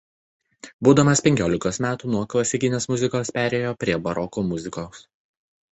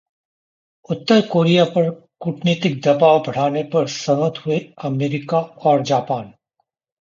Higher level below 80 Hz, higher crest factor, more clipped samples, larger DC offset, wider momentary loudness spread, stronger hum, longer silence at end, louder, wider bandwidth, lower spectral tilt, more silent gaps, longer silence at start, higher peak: first, -50 dBFS vs -64 dBFS; about the same, 22 dB vs 18 dB; neither; neither; about the same, 10 LU vs 11 LU; neither; about the same, 0.75 s vs 0.7 s; second, -22 LUFS vs -18 LUFS; first, 8.4 kHz vs 7.6 kHz; second, -5 dB/octave vs -6.5 dB/octave; first, 0.74-0.79 s vs none; second, 0.65 s vs 0.9 s; about the same, -2 dBFS vs -2 dBFS